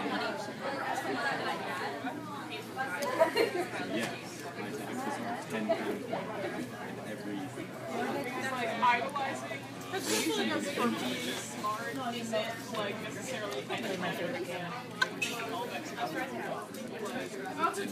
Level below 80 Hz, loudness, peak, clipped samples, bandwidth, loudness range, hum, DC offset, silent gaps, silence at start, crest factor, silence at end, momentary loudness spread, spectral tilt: -76 dBFS; -35 LUFS; -12 dBFS; under 0.1%; 15.5 kHz; 4 LU; none; under 0.1%; none; 0 s; 24 dB; 0 s; 10 LU; -3.5 dB/octave